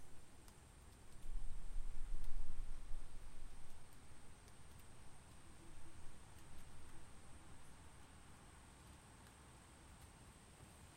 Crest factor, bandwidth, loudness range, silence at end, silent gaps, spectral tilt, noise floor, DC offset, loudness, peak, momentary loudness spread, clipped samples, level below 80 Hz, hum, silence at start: 16 dB; 10 kHz; 6 LU; 0 s; none; -4.5 dB/octave; -62 dBFS; under 0.1%; -60 LUFS; -26 dBFS; 9 LU; under 0.1%; -50 dBFS; none; 0 s